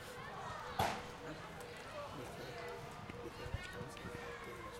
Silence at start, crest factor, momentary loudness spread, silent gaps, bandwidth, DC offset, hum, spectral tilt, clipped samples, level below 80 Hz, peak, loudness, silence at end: 0 s; 24 dB; 10 LU; none; 16 kHz; under 0.1%; none; -4.5 dB/octave; under 0.1%; -60 dBFS; -22 dBFS; -46 LUFS; 0 s